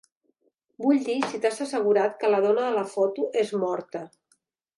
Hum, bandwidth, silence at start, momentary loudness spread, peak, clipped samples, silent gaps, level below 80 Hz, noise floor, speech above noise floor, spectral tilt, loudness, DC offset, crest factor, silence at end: none; 11.5 kHz; 0.8 s; 8 LU; -8 dBFS; under 0.1%; none; -80 dBFS; -71 dBFS; 46 dB; -5 dB/octave; -25 LUFS; under 0.1%; 18 dB; 0.7 s